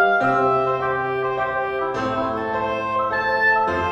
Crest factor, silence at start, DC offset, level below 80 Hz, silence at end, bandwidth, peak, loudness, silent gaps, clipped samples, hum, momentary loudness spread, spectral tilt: 14 dB; 0 s; under 0.1%; -50 dBFS; 0 s; 8.4 kHz; -6 dBFS; -21 LUFS; none; under 0.1%; none; 6 LU; -6 dB/octave